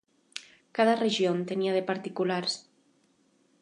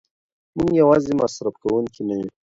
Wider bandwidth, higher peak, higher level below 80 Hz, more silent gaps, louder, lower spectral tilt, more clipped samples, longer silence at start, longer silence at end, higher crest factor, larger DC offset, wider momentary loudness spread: first, 11 kHz vs 7.8 kHz; second, -10 dBFS vs -4 dBFS; second, -82 dBFS vs -52 dBFS; neither; second, -28 LUFS vs -20 LUFS; second, -5 dB/octave vs -7 dB/octave; neither; second, 0.35 s vs 0.55 s; first, 1 s vs 0.15 s; about the same, 20 dB vs 16 dB; neither; first, 18 LU vs 11 LU